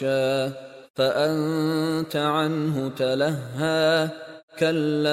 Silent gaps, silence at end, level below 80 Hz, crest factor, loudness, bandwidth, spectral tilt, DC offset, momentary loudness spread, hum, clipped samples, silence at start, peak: 0.90-0.94 s, 4.43-4.48 s; 0 s; -66 dBFS; 14 dB; -24 LUFS; 16 kHz; -6 dB/octave; under 0.1%; 9 LU; none; under 0.1%; 0 s; -8 dBFS